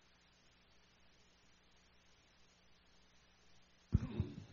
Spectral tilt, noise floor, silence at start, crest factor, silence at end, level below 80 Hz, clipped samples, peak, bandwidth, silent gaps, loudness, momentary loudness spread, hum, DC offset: -8 dB/octave; -70 dBFS; 3.5 s; 30 dB; 0 s; -54 dBFS; under 0.1%; -18 dBFS; 7 kHz; none; -42 LUFS; 29 LU; 60 Hz at -75 dBFS; under 0.1%